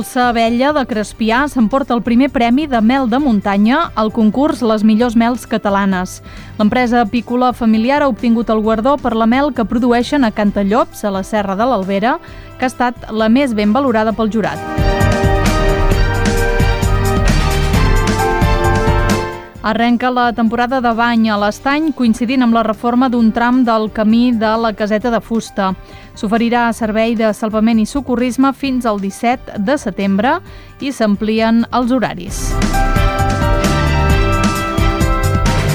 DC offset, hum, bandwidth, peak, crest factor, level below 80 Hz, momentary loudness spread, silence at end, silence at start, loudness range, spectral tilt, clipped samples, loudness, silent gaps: under 0.1%; none; 19 kHz; 0 dBFS; 14 dB; -22 dBFS; 5 LU; 0 s; 0 s; 2 LU; -6 dB/octave; under 0.1%; -14 LUFS; none